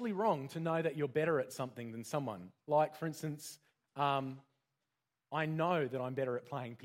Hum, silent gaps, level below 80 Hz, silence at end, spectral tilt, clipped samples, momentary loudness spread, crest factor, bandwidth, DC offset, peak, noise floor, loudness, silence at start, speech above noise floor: none; none; -82 dBFS; 0 s; -6 dB/octave; under 0.1%; 13 LU; 18 dB; 16 kHz; under 0.1%; -20 dBFS; -89 dBFS; -37 LUFS; 0 s; 52 dB